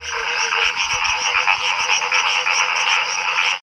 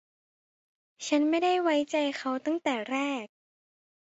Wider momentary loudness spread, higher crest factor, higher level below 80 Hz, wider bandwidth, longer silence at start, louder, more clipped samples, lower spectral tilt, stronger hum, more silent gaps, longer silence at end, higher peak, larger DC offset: second, 3 LU vs 10 LU; about the same, 18 dB vs 18 dB; first, -52 dBFS vs -78 dBFS; first, 15.5 kHz vs 8 kHz; second, 0 s vs 1 s; first, -17 LUFS vs -28 LUFS; neither; second, 2 dB/octave vs -2.5 dB/octave; neither; neither; second, 0.05 s vs 0.85 s; first, 0 dBFS vs -14 dBFS; neither